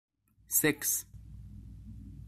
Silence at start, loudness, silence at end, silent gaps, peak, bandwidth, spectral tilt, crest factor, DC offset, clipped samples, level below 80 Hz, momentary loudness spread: 0.5 s; -29 LUFS; 0 s; none; -14 dBFS; 15.5 kHz; -2.5 dB/octave; 22 dB; under 0.1%; under 0.1%; -54 dBFS; 23 LU